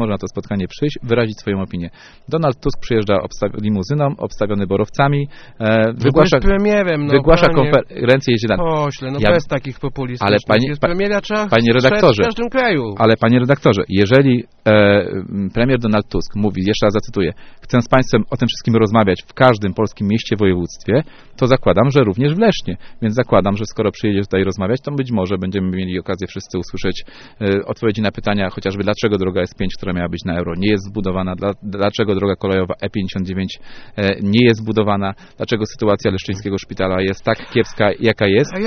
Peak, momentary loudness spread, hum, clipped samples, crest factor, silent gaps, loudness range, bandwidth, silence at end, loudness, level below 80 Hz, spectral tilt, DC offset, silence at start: 0 dBFS; 10 LU; none; under 0.1%; 16 dB; none; 6 LU; 6.6 kHz; 0 s; -17 LUFS; -34 dBFS; -5.5 dB/octave; under 0.1%; 0 s